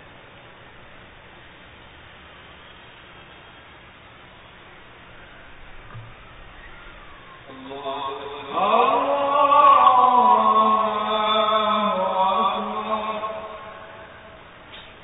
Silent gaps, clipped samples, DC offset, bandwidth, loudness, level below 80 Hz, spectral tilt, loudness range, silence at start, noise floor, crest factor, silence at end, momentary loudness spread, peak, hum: none; under 0.1%; under 0.1%; 4 kHz; -19 LUFS; -54 dBFS; -8.5 dB/octave; 19 LU; 0.95 s; -46 dBFS; 18 dB; 0.15 s; 27 LU; -6 dBFS; none